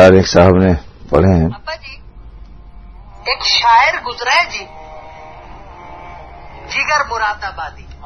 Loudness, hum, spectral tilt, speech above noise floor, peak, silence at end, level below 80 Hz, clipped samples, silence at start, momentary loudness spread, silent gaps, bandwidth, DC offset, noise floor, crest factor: -13 LUFS; none; -5 dB/octave; 22 dB; 0 dBFS; 0 s; -34 dBFS; 0.3%; 0 s; 26 LU; none; 7.8 kHz; under 0.1%; -35 dBFS; 14 dB